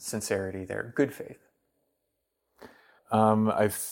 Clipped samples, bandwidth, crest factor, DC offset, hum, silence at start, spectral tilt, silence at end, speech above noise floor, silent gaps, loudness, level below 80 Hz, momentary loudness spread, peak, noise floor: under 0.1%; 17 kHz; 22 dB; under 0.1%; none; 0 s; -5.5 dB/octave; 0 s; 53 dB; none; -28 LUFS; -70 dBFS; 12 LU; -8 dBFS; -80 dBFS